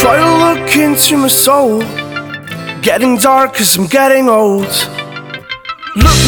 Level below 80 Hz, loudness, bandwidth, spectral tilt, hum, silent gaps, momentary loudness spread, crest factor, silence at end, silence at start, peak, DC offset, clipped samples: -26 dBFS; -9 LUFS; over 20 kHz; -3.5 dB/octave; none; none; 15 LU; 10 dB; 0 s; 0 s; 0 dBFS; under 0.1%; 0.7%